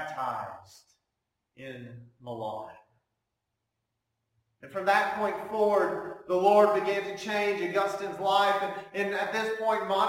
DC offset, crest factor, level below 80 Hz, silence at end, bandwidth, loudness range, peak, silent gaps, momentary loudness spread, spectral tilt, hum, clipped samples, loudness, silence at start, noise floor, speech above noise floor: under 0.1%; 20 dB; -72 dBFS; 0 s; 16.5 kHz; 18 LU; -10 dBFS; none; 19 LU; -4.5 dB/octave; none; under 0.1%; -28 LUFS; 0 s; -84 dBFS; 55 dB